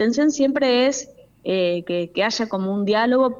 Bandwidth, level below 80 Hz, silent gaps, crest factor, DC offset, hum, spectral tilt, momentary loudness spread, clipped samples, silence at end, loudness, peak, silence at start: 7.6 kHz; -62 dBFS; none; 12 dB; under 0.1%; none; -4.5 dB/octave; 8 LU; under 0.1%; 0 s; -20 LUFS; -8 dBFS; 0 s